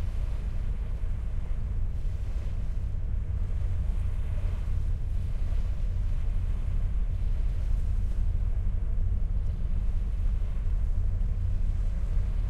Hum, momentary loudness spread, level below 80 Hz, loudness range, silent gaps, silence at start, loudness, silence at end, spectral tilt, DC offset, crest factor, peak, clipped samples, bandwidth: none; 3 LU; -28 dBFS; 2 LU; none; 0 s; -33 LUFS; 0 s; -8 dB/octave; under 0.1%; 10 dB; -16 dBFS; under 0.1%; 3.8 kHz